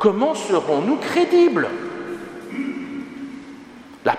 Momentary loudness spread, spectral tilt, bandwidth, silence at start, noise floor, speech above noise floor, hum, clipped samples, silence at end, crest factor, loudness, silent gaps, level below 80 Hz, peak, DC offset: 20 LU; -5.5 dB/octave; 10.5 kHz; 0 s; -41 dBFS; 23 dB; none; under 0.1%; 0 s; 20 dB; -20 LUFS; none; -64 dBFS; -2 dBFS; under 0.1%